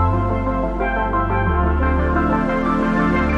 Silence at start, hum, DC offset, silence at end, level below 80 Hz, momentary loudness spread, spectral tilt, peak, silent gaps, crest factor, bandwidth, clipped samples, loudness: 0 s; none; under 0.1%; 0 s; -24 dBFS; 3 LU; -9 dB/octave; -6 dBFS; none; 12 dB; 7 kHz; under 0.1%; -19 LUFS